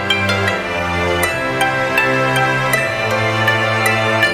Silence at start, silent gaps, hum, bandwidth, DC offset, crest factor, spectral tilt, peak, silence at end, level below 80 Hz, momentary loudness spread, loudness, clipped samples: 0 s; none; none; 15.5 kHz; under 0.1%; 16 dB; -4 dB/octave; 0 dBFS; 0 s; -42 dBFS; 3 LU; -15 LUFS; under 0.1%